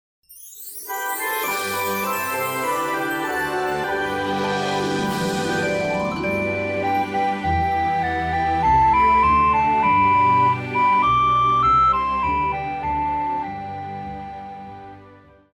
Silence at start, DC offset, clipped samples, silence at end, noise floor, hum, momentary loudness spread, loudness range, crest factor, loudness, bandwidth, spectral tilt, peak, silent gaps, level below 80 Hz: 0.3 s; under 0.1%; under 0.1%; 0.4 s; -48 dBFS; none; 15 LU; 7 LU; 12 dB; -20 LUFS; over 20 kHz; -4.5 dB/octave; -8 dBFS; none; -42 dBFS